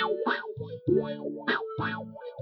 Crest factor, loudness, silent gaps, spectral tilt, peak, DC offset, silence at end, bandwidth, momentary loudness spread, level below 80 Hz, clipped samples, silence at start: 18 dB; -31 LUFS; none; -8.5 dB/octave; -14 dBFS; under 0.1%; 0 s; 6 kHz; 10 LU; -66 dBFS; under 0.1%; 0 s